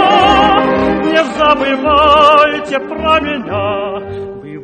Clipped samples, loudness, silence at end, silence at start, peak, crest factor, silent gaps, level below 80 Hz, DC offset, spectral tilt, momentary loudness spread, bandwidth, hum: 0.1%; -11 LUFS; 0 s; 0 s; 0 dBFS; 12 dB; none; -34 dBFS; under 0.1%; -5 dB/octave; 14 LU; 9.2 kHz; none